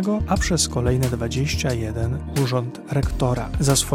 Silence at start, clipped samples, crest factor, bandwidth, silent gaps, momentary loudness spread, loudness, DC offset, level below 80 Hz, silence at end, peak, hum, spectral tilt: 0 s; under 0.1%; 16 dB; 16.5 kHz; none; 6 LU; -22 LUFS; under 0.1%; -32 dBFS; 0 s; -6 dBFS; none; -5 dB/octave